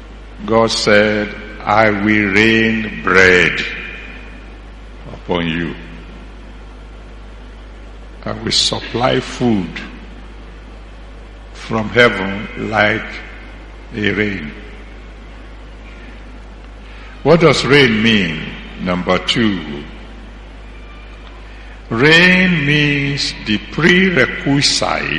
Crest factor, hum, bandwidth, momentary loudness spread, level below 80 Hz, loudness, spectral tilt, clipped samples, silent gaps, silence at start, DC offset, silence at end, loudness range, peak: 16 dB; none; 11 kHz; 26 LU; -34 dBFS; -13 LUFS; -4.5 dB/octave; under 0.1%; none; 0 s; under 0.1%; 0 s; 12 LU; 0 dBFS